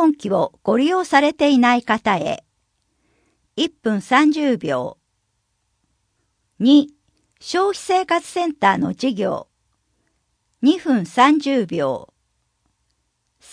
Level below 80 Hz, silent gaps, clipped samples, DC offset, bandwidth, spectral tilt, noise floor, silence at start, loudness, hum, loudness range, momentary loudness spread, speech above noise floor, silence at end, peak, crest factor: -64 dBFS; none; under 0.1%; under 0.1%; 10.5 kHz; -5 dB/octave; -70 dBFS; 0 s; -18 LUFS; none; 3 LU; 10 LU; 53 dB; 1.5 s; 0 dBFS; 20 dB